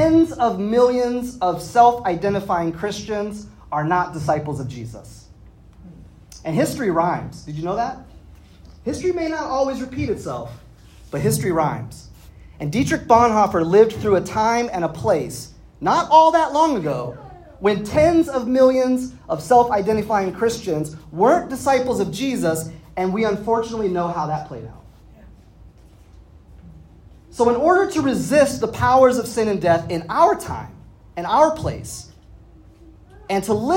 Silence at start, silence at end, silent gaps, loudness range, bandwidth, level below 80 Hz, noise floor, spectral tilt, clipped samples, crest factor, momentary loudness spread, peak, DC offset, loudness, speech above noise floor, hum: 0 s; 0 s; none; 8 LU; 16.5 kHz; -46 dBFS; -46 dBFS; -6 dB/octave; under 0.1%; 20 dB; 16 LU; 0 dBFS; under 0.1%; -19 LUFS; 28 dB; none